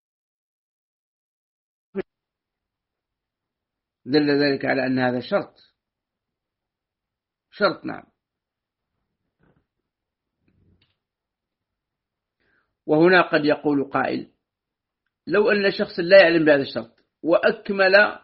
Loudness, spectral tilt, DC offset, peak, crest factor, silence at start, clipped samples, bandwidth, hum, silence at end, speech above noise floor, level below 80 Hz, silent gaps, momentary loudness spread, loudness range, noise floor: -19 LUFS; -3 dB/octave; under 0.1%; -2 dBFS; 22 dB; 1.95 s; under 0.1%; 5.8 kHz; none; 0.05 s; 67 dB; -66 dBFS; none; 19 LU; 22 LU; -86 dBFS